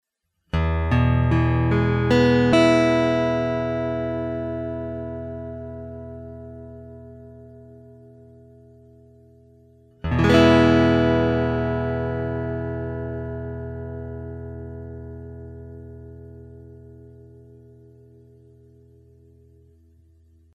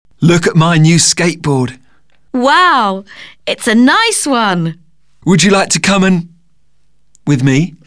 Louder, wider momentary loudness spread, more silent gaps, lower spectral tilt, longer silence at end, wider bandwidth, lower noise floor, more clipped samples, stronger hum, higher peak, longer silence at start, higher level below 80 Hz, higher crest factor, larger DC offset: second, -21 LUFS vs -11 LUFS; first, 24 LU vs 13 LU; neither; first, -7.5 dB/octave vs -4.5 dB/octave; first, 3.3 s vs 0.15 s; second, 9.8 kHz vs 11 kHz; first, -71 dBFS vs -61 dBFS; neither; neither; about the same, -2 dBFS vs 0 dBFS; first, 0.55 s vs 0.2 s; first, -38 dBFS vs -44 dBFS; first, 22 dB vs 12 dB; second, under 0.1% vs 0.6%